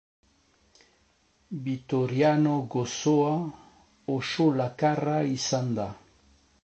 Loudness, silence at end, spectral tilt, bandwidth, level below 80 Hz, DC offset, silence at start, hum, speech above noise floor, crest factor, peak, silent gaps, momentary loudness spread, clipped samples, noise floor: -27 LUFS; 0.65 s; -6 dB/octave; 8.4 kHz; -64 dBFS; under 0.1%; 1.5 s; none; 40 dB; 18 dB; -10 dBFS; none; 12 LU; under 0.1%; -66 dBFS